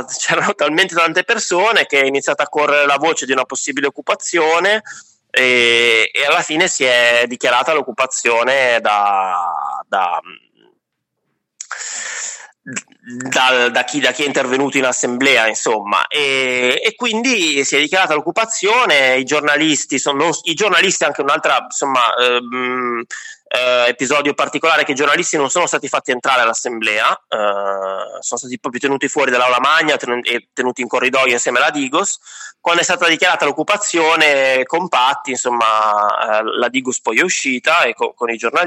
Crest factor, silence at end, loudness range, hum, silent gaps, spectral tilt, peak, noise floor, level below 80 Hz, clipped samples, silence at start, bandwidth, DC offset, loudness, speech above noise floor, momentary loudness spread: 14 dB; 0 s; 4 LU; none; none; -1.5 dB/octave; 0 dBFS; -74 dBFS; -70 dBFS; under 0.1%; 0 s; 16 kHz; under 0.1%; -14 LUFS; 58 dB; 9 LU